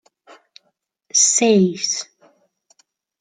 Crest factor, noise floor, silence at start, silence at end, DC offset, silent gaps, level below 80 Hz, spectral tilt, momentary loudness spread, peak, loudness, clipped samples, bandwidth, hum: 18 dB; -70 dBFS; 1.15 s; 1.15 s; under 0.1%; none; -70 dBFS; -3 dB/octave; 12 LU; -4 dBFS; -16 LUFS; under 0.1%; 10.5 kHz; none